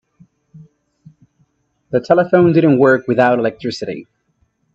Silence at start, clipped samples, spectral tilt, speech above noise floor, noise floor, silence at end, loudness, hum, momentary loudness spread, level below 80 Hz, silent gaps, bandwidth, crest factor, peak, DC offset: 0.55 s; under 0.1%; -7.5 dB/octave; 50 dB; -63 dBFS; 0.75 s; -14 LUFS; none; 14 LU; -58 dBFS; none; 7.8 kHz; 16 dB; 0 dBFS; under 0.1%